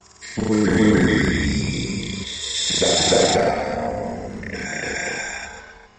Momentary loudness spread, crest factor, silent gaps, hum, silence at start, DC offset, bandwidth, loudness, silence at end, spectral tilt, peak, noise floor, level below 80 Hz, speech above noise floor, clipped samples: 14 LU; 16 dB; none; none; 0.2 s; under 0.1%; 10.5 kHz; -20 LUFS; 0.15 s; -4 dB/octave; -4 dBFS; -41 dBFS; -38 dBFS; 24 dB; under 0.1%